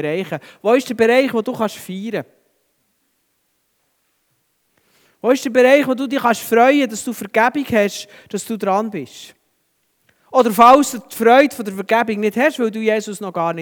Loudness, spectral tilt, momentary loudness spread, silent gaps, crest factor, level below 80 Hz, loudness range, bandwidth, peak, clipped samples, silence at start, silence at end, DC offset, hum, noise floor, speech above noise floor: -16 LUFS; -4.5 dB/octave; 14 LU; none; 18 dB; -60 dBFS; 12 LU; over 20 kHz; 0 dBFS; under 0.1%; 0 s; 0 s; under 0.1%; none; -67 dBFS; 51 dB